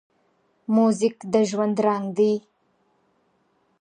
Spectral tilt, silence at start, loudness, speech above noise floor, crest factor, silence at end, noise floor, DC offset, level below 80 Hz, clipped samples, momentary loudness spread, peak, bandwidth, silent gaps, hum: -6.5 dB/octave; 0.7 s; -22 LUFS; 46 dB; 18 dB; 1.4 s; -67 dBFS; under 0.1%; -74 dBFS; under 0.1%; 4 LU; -8 dBFS; 9.8 kHz; none; none